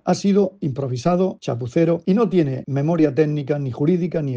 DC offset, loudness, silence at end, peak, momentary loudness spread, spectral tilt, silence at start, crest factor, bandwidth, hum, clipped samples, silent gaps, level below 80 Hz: under 0.1%; -20 LUFS; 0 s; -4 dBFS; 6 LU; -8 dB/octave; 0.05 s; 14 dB; 8.2 kHz; none; under 0.1%; none; -58 dBFS